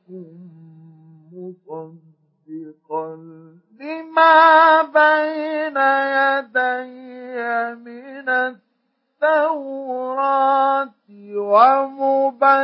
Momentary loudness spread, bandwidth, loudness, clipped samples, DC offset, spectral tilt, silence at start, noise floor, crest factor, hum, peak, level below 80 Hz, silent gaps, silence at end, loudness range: 24 LU; 5.8 kHz; -17 LUFS; under 0.1%; under 0.1%; -8.5 dB/octave; 0.1 s; -70 dBFS; 18 dB; none; -2 dBFS; -90 dBFS; none; 0 s; 19 LU